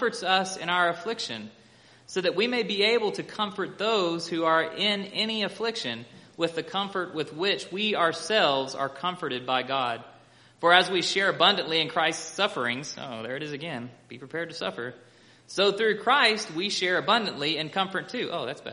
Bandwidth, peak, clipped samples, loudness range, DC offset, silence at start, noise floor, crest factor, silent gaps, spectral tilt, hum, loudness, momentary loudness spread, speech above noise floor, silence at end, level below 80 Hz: 10.5 kHz; -2 dBFS; under 0.1%; 5 LU; under 0.1%; 0 s; -55 dBFS; 24 dB; none; -3 dB/octave; none; -26 LUFS; 13 LU; 28 dB; 0 s; -76 dBFS